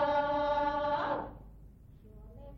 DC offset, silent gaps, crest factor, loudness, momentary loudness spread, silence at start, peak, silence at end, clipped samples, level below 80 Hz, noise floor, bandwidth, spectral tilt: under 0.1%; none; 14 dB; -32 LUFS; 23 LU; 0 s; -18 dBFS; 0 s; under 0.1%; -54 dBFS; -54 dBFS; 6.2 kHz; -6.5 dB/octave